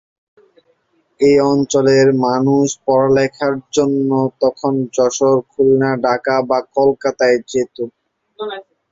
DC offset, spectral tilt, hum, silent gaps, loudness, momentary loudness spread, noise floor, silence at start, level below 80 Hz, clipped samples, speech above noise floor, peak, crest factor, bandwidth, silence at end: under 0.1%; -5.5 dB/octave; none; none; -15 LUFS; 10 LU; -61 dBFS; 1.2 s; -54 dBFS; under 0.1%; 46 dB; -2 dBFS; 14 dB; 7.8 kHz; 0.3 s